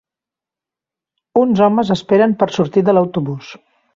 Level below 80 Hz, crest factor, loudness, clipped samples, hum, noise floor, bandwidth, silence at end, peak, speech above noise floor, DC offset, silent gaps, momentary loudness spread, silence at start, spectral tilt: -56 dBFS; 16 dB; -15 LUFS; under 0.1%; none; -87 dBFS; 7.6 kHz; 0.4 s; -2 dBFS; 73 dB; under 0.1%; none; 9 LU; 1.35 s; -7.5 dB/octave